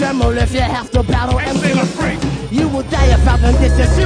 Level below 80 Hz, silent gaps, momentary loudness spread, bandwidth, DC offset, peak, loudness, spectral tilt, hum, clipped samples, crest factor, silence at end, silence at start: -16 dBFS; none; 6 LU; 10 kHz; under 0.1%; 0 dBFS; -15 LUFS; -6 dB/octave; none; under 0.1%; 12 dB; 0 s; 0 s